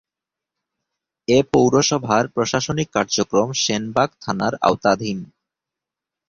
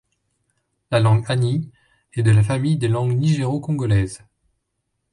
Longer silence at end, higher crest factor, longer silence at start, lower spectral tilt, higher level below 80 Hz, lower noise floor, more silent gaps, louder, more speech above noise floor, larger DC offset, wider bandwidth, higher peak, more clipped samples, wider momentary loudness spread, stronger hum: about the same, 1.05 s vs 0.95 s; about the same, 20 dB vs 16 dB; first, 1.3 s vs 0.9 s; second, -4 dB/octave vs -7 dB/octave; second, -52 dBFS vs -44 dBFS; first, -87 dBFS vs -75 dBFS; neither; about the same, -19 LUFS vs -20 LUFS; first, 68 dB vs 57 dB; neither; second, 7.6 kHz vs 11 kHz; first, -2 dBFS vs -6 dBFS; neither; second, 7 LU vs 11 LU; neither